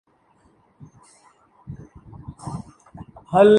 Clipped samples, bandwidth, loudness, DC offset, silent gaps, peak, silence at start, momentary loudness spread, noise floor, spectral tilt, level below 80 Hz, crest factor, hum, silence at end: under 0.1%; 10 kHz; -24 LUFS; under 0.1%; none; -2 dBFS; 1.7 s; 24 LU; -60 dBFS; -7 dB/octave; -54 dBFS; 22 dB; none; 0 s